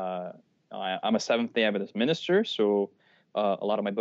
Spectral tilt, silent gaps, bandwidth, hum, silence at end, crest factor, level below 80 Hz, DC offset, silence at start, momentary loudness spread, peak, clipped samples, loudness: -3.5 dB/octave; none; 7.6 kHz; none; 0 s; 18 dB; -86 dBFS; under 0.1%; 0 s; 11 LU; -10 dBFS; under 0.1%; -28 LUFS